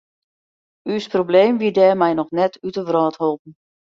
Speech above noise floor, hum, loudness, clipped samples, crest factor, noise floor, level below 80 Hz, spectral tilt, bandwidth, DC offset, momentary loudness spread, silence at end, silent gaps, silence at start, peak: over 73 dB; none; -18 LUFS; under 0.1%; 18 dB; under -90 dBFS; -64 dBFS; -7 dB/octave; 7.4 kHz; under 0.1%; 11 LU; 0.45 s; 3.39-3.45 s; 0.85 s; -2 dBFS